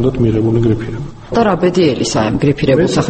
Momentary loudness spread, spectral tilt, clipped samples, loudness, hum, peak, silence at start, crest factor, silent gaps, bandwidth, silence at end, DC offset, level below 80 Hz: 7 LU; -6.5 dB/octave; under 0.1%; -14 LUFS; none; 0 dBFS; 0 s; 12 dB; none; 8.8 kHz; 0 s; under 0.1%; -32 dBFS